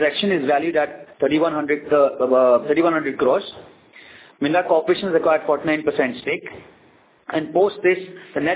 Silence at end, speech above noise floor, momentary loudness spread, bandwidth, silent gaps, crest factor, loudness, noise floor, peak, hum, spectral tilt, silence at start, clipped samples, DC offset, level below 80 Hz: 0 s; 35 dB; 9 LU; 4 kHz; none; 16 dB; -20 LUFS; -54 dBFS; -4 dBFS; none; -9 dB/octave; 0 s; under 0.1%; under 0.1%; -60 dBFS